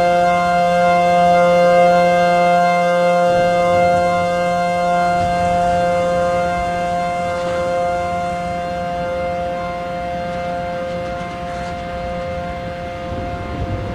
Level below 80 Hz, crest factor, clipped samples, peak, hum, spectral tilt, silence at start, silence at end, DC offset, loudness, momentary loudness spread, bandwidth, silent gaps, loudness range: -38 dBFS; 14 dB; under 0.1%; -4 dBFS; none; -5.5 dB/octave; 0 s; 0 s; under 0.1%; -17 LUFS; 13 LU; 12.5 kHz; none; 11 LU